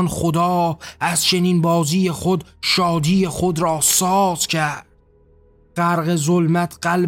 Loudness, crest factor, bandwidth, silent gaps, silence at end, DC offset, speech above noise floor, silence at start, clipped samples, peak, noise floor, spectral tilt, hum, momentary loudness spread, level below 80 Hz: -18 LUFS; 16 dB; 17 kHz; none; 0 s; under 0.1%; 35 dB; 0 s; under 0.1%; -2 dBFS; -53 dBFS; -4 dB/octave; none; 7 LU; -46 dBFS